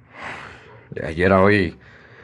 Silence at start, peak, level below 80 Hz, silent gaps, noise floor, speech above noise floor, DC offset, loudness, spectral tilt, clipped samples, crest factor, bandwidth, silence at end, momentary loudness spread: 0.15 s; -2 dBFS; -50 dBFS; none; -42 dBFS; 24 dB; under 0.1%; -18 LUFS; -7.5 dB/octave; under 0.1%; 20 dB; 11 kHz; 0.5 s; 21 LU